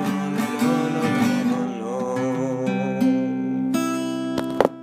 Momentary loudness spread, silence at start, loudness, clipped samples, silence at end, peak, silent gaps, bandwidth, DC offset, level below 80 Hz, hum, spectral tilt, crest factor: 5 LU; 0 s; -23 LUFS; under 0.1%; 0 s; -2 dBFS; none; 15.5 kHz; under 0.1%; -62 dBFS; none; -6 dB/octave; 22 dB